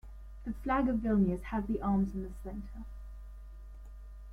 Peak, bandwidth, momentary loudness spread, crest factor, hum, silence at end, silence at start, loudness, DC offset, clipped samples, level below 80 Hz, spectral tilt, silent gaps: -18 dBFS; 11 kHz; 22 LU; 16 dB; none; 0 s; 0.05 s; -33 LUFS; under 0.1%; under 0.1%; -44 dBFS; -9 dB/octave; none